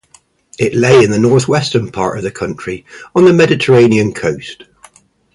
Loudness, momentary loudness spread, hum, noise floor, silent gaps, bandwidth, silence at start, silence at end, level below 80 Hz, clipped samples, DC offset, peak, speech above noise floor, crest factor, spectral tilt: -12 LUFS; 15 LU; none; -49 dBFS; none; 11.5 kHz; 0.6 s; 0.8 s; -46 dBFS; under 0.1%; under 0.1%; 0 dBFS; 38 dB; 12 dB; -6 dB/octave